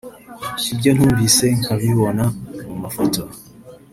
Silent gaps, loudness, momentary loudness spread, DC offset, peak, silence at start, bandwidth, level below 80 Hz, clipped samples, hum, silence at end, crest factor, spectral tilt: none; -17 LUFS; 17 LU; under 0.1%; 0 dBFS; 0.05 s; 16 kHz; -44 dBFS; under 0.1%; none; 0.15 s; 18 dB; -4.5 dB/octave